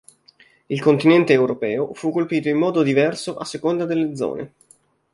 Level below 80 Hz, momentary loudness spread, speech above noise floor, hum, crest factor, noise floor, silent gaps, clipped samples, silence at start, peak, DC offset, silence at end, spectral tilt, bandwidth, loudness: -64 dBFS; 13 LU; 35 dB; none; 18 dB; -54 dBFS; none; under 0.1%; 0.7 s; -2 dBFS; under 0.1%; 0.65 s; -6.5 dB/octave; 11.5 kHz; -20 LUFS